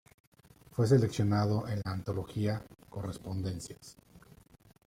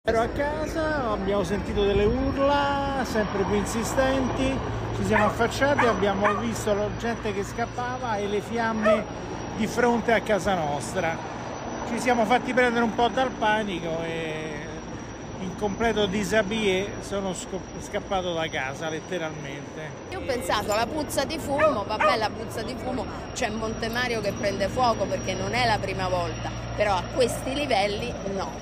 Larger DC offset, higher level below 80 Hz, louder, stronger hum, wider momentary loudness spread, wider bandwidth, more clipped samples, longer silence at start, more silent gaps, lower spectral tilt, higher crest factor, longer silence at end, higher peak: neither; second, -60 dBFS vs -42 dBFS; second, -33 LUFS vs -26 LUFS; neither; first, 18 LU vs 10 LU; about the same, 15.5 kHz vs 15.5 kHz; neither; first, 0.75 s vs 0.05 s; neither; first, -7 dB/octave vs -5 dB/octave; about the same, 20 dB vs 16 dB; first, 0.7 s vs 0 s; about the same, -12 dBFS vs -10 dBFS